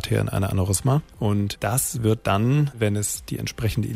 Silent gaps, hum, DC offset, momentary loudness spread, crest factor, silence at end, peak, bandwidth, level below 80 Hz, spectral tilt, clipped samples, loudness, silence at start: none; none; under 0.1%; 5 LU; 16 dB; 0 s; -8 dBFS; 16 kHz; -44 dBFS; -5.5 dB/octave; under 0.1%; -23 LUFS; 0 s